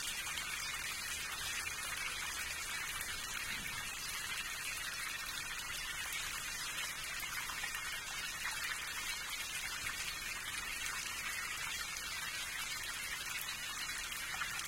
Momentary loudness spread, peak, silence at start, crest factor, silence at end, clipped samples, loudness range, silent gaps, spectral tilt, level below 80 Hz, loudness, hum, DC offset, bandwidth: 1 LU; -22 dBFS; 0 s; 20 dB; 0 s; under 0.1%; 1 LU; none; 0.5 dB/octave; -60 dBFS; -39 LUFS; none; under 0.1%; 17 kHz